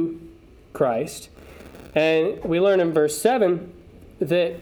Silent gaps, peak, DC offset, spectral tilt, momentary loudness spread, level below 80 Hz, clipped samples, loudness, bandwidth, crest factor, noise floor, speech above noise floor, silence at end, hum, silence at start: none; -4 dBFS; under 0.1%; -5 dB/octave; 20 LU; -52 dBFS; under 0.1%; -22 LUFS; 19.5 kHz; 18 dB; -46 dBFS; 26 dB; 0 s; none; 0 s